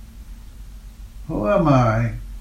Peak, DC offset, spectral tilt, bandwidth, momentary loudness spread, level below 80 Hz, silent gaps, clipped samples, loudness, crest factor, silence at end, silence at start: -4 dBFS; under 0.1%; -8.5 dB/octave; 13.5 kHz; 25 LU; -34 dBFS; none; under 0.1%; -19 LUFS; 18 dB; 0 s; 0 s